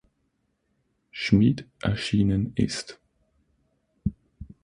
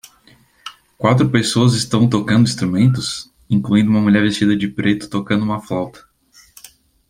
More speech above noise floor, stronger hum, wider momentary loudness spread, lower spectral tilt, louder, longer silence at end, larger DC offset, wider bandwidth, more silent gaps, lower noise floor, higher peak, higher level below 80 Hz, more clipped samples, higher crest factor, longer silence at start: first, 50 dB vs 36 dB; neither; about the same, 13 LU vs 13 LU; about the same, -6 dB/octave vs -6 dB/octave; second, -25 LUFS vs -16 LUFS; second, 0.2 s vs 1.1 s; neither; second, 10.5 kHz vs 15.5 kHz; neither; first, -73 dBFS vs -51 dBFS; second, -6 dBFS vs -2 dBFS; about the same, -46 dBFS vs -50 dBFS; neither; first, 22 dB vs 16 dB; first, 1.15 s vs 0.65 s